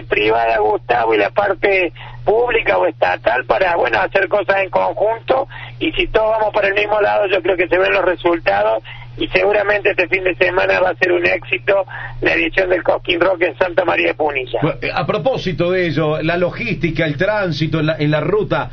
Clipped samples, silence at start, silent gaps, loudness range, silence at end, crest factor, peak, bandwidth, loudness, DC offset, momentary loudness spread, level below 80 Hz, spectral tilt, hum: under 0.1%; 0 s; none; 2 LU; 0 s; 16 dB; 0 dBFS; 6.6 kHz; -16 LUFS; under 0.1%; 4 LU; -38 dBFS; -7 dB/octave; none